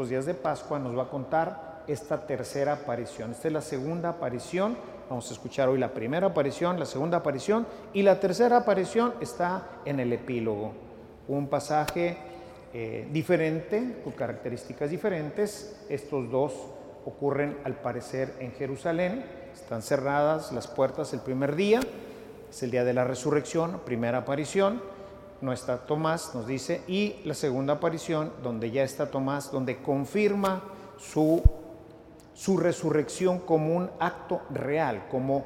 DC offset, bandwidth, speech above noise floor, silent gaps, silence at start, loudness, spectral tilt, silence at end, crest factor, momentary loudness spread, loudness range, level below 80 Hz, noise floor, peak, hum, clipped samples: under 0.1%; 16.5 kHz; 22 dB; none; 0 s; -29 LUFS; -6 dB/octave; 0 s; 24 dB; 12 LU; 5 LU; -44 dBFS; -50 dBFS; -6 dBFS; none; under 0.1%